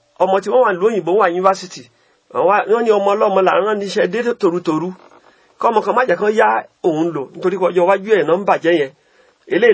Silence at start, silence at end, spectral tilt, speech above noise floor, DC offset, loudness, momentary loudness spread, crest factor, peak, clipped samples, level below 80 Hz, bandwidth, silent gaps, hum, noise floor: 0.2 s; 0 s; -5.5 dB/octave; 34 dB; under 0.1%; -16 LUFS; 8 LU; 16 dB; 0 dBFS; under 0.1%; -66 dBFS; 8 kHz; none; none; -49 dBFS